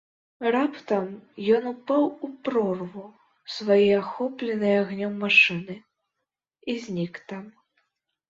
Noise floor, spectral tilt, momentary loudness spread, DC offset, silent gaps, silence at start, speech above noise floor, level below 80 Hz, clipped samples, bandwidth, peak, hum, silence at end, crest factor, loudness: -84 dBFS; -6 dB/octave; 19 LU; under 0.1%; none; 0.4 s; 59 dB; -68 dBFS; under 0.1%; 7.6 kHz; -4 dBFS; none; 0.8 s; 22 dB; -24 LUFS